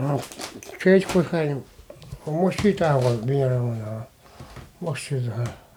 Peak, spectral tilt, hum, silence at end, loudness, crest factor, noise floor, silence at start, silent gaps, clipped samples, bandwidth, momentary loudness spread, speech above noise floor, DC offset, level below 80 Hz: -6 dBFS; -7 dB/octave; none; 0.2 s; -23 LUFS; 18 dB; -43 dBFS; 0 s; none; under 0.1%; 18 kHz; 18 LU; 20 dB; under 0.1%; -52 dBFS